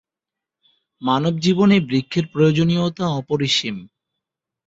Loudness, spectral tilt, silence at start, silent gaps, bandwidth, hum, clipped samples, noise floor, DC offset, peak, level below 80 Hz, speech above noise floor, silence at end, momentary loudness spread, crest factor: -19 LUFS; -6 dB/octave; 1 s; none; 8 kHz; none; under 0.1%; -86 dBFS; under 0.1%; -4 dBFS; -56 dBFS; 68 dB; 0.8 s; 8 LU; 16 dB